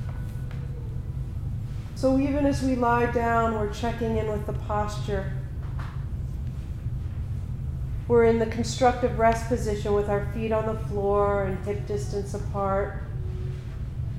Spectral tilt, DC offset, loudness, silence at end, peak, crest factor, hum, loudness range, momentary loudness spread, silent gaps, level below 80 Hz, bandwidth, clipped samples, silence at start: -7 dB/octave; under 0.1%; -27 LUFS; 0 s; -8 dBFS; 18 dB; none; 6 LU; 11 LU; none; -36 dBFS; 14.5 kHz; under 0.1%; 0 s